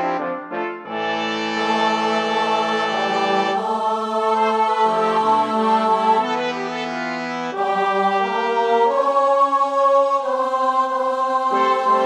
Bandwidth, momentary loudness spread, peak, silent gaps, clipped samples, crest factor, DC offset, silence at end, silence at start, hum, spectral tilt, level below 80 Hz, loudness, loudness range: 11.5 kHz; 8 LU; -6 dBFS; none; under 0.1%; 14 dB; under 0.1%; 0 s; 0 s; none; -4 dB/octave; -72 dBFS; -19 LUFS; 2 LU